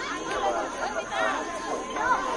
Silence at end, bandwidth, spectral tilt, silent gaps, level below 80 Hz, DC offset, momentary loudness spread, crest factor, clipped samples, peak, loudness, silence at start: 0 s; 11.5 kHz; -2.5 dB/octave; none; -54 dBFS; under 0.1%; 5 LU; 16 dB; under 0.1%; -12 dBFS; -28 LUFS; 0 s